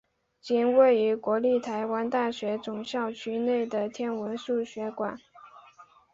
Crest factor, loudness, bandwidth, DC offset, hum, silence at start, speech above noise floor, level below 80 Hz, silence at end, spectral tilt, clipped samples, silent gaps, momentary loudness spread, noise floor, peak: 18 dB; -28 LUFS; 7.8 kHz; under 0.1%; none; 0.45 s; 28 dB; -72 dBFS; 0.3 s; -5.5 dB/octave; under 0.1%; none; 12 LU; -55 dBFS; -10 dBFS